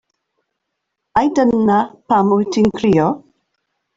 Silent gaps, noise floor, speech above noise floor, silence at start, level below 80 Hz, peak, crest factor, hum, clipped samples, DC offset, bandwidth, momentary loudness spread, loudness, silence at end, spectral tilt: none; -76 dBFS; 61 dB; 1.15 s; -50 dBFS; -2 dBFS; 14 dB; none; under 0.1%; under 0.1%; 7.8 kHz; 5 LU; -15 LUFS; 0.8 s; -7 dB/octave